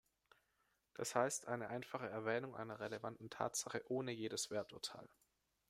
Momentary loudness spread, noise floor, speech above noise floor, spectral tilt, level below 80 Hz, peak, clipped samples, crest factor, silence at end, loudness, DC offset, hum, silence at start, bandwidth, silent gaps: 9 LU; -83 dBFS; 39 dB; -3.5 dB/octave; -82 dBFS; -20 dBFS; under 0.1%; 24 dB; 0.65 s; -44 LUFS; under 0.1%; none; 1 s; 16 kHz; none